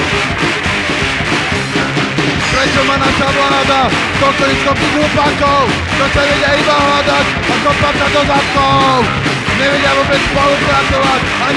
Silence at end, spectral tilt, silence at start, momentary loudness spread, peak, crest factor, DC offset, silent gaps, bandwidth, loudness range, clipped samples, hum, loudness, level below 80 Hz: 0 s; -4 dB/octave; 0 s; 3 LU; 0 dBFS; 12 dB; under 0.1%; none; 13 kHz; 1 LU; under 0.1%; none; -11 LUFS; -30 dBFS